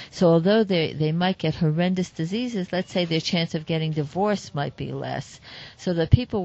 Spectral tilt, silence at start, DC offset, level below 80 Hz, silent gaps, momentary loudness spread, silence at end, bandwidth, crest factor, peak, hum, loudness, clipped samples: -6.5 dB/octave; 0 s; under 0.1%; -42 dBFS; none; 12 LU; 0 s; 8.2 kHz; 22 dB; -2 dBFS; none; -24 LUFS; under 0.1%